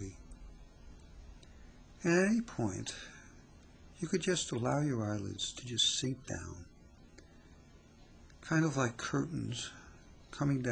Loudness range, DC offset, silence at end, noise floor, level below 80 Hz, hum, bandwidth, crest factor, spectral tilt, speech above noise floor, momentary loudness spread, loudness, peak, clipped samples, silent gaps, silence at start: 3 LU; under 0.1%; 0 s; -59 dBFS; -58 dBFS; none; 10.5 kHz; 20 dB; -4.5 dB/octave; 24 dB; 25 LU; -35 LUFS; -18 dBFS; under 0.1%; none; 0 s